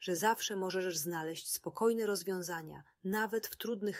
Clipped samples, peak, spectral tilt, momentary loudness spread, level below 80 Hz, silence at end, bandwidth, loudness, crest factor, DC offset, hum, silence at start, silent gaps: under 0.1%; -18 dBFS; -3.5 dB/octave; 8 LU; -78 dBFS; 0 s; 16 kHz; -36 LUFS; 18 dB; under 0.1%; none; 0 s; none